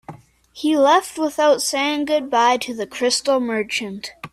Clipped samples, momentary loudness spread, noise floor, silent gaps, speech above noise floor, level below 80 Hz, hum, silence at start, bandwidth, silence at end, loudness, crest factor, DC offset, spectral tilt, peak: under 0.1%; 9 LU; -41 dBFS; none; 22 dB; -62 dBFS; none; 0.1 s; 15 kHz; 0.05 s; -19 LUFS; 16 dB; under 0.1%; -2.5 dB/octave; -4 dBFS